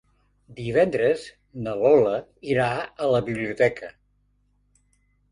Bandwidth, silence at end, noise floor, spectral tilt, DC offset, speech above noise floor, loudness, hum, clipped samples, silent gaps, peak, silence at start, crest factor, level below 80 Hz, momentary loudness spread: 10.5 kHz; 1.4 s; -66 dBFS; -6.5 dB/octave; under 0.1%; 43 dB; -23 LUFS; 50 Hz at -55 dBFS; under 0.1%; none; -6 dBFS; 0.5 s; 18 dB; -56 dBFS; 16 LU